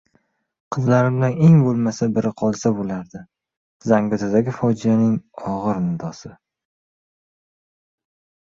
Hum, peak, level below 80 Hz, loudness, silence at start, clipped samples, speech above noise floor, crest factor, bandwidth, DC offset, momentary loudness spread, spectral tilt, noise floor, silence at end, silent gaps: none; -4 dBFS; -56 dBFS; -19 LUFS; 0.7 s; under 0.1%; 47 dB; 18 dB; 7.6 kHz; under 0.1%; 15 LU; -8 dB/octave; -65 dBFS; 2.15 s; 3.57-3.80 s